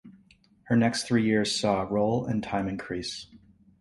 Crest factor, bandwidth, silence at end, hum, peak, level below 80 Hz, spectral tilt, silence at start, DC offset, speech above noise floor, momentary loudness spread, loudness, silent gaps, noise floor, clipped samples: 18 dB; 11.5 kHz; 0.45 s; none; -10 dBFS; -56 dBFS; -5 dB/octave; 0.05 s; under 0.1%; 34 dB; 9 LU; -27 LUFS; none; -60 dBFS; under 0.1%